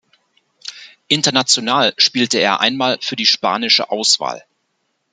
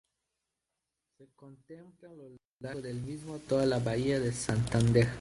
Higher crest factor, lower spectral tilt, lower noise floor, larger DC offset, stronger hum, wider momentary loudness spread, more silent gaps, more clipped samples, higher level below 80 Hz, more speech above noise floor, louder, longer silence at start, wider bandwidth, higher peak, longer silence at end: about the same, 18 dB vs 22 dB; second, -2 dB/octave vs -6 dB/octave; second, -69 dBFS vs -87 dBFS; neither; neither; second, 19 LU vs 25 LU; second, none vs 2.45-2.57 s; neither; second, -66 dBFS vs -54 dBFS; about the same, 53 dB vs 55 dB; first, -14 LUFS vs -31 LUFS; second, 0.65 s vs 1.2 s; about the same, 12 kHz vs 11.5 kHz; first, 0 dBFS vs -12 dBFS; first, 0.75 s vs 0 s